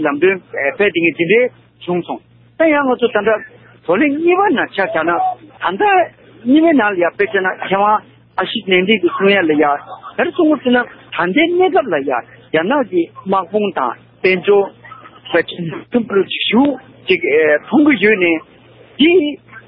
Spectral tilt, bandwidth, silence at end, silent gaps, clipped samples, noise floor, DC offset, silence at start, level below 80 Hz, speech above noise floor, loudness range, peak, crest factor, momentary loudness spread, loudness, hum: -10.5 dB/octave; 5.4 kHz; 0.1 s; none; under 0.1%; -37 dBFS; under 0.1%; 0 s; -58 dBFS; 23 dB; 3 LU; 0 dBFS; 14 dB; 10 LU; -15 LUFS; none